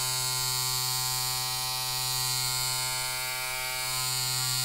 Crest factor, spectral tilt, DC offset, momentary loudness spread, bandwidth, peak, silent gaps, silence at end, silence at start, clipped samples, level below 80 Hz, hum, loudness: 16 dB; -0.5 dB/octave; under 0.1%; 3 LU; 16 kHz; -14 dBFS; none; 0 s; 0 s; under 0.1%; -54 dBFS; none; -27 LUFS